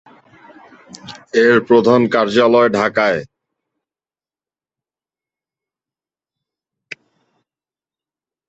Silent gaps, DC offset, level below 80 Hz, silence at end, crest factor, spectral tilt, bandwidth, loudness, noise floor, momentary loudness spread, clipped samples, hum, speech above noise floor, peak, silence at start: none; under 0.1%; -60 dBFS; 5.25 s; 18 dB; -6 dB/octave; 8 kHz; -13 LUFS; under -90 dBFS; 24 LU; under 0.1%; none; over 77 dB; -2 dBFS; 1.05 s